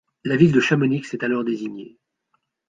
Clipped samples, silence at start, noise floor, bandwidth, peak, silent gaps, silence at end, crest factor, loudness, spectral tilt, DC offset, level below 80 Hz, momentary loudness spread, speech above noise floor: under 0.1%; 0.25 s; -71 dBFS; 9.2 kHz; -2 dBFS; none; 0.8 s; 20 dB; -20 LUFS; -7 dB/octave; under 0.1%; -56 dBFS; 14 LU; 52 dB